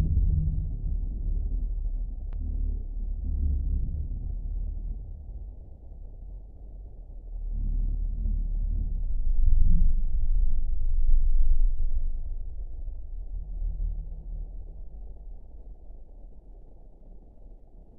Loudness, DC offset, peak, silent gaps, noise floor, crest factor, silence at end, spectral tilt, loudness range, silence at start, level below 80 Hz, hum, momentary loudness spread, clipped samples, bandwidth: -33 LUFS; under 0.1%; -8 dBFS; none; -47 dBFS; 18 dB; 0.15 s; -15 dB/octave; 12 LU; 0 s; -26 dBFS; none; 21 LU; under 0.1%; 0.8 kHz